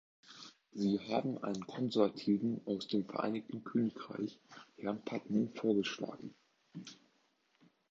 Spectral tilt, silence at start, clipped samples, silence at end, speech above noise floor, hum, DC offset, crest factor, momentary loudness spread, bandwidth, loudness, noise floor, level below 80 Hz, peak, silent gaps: -5.5 dB/octave; 0.3 s; under 0.1%; 0.95 s; 39 dB; none; under 0.1%; 22 dB; 20 LU; 7.6 kHz; -37 LUFS; -75 dBFS; -80 dBFS; -16 dBFS; none